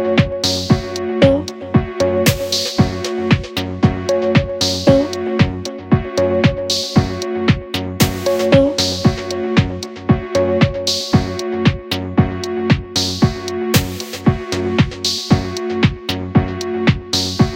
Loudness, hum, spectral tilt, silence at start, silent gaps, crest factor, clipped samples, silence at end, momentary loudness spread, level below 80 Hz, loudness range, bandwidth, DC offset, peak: -17 LUFS; none; -5.5 dB/octave; 0 s; none; 16 dB; under 0.1%; 0 s; 7 LU; -34 dBFS; 2 LU; 17 kHz; under 0.1%; 0 dBFS